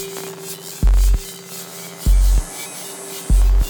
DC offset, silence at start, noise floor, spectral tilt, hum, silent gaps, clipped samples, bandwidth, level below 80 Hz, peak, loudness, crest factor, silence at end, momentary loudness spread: under 0.1%; 0 s; -33 dBFS; -4.5 dB/octave; none; none; under 0.1%; over 20 kHz; -18 dBFS; -4 dBFS; -22 LUFS; 12 dB; 0 s; 13 LU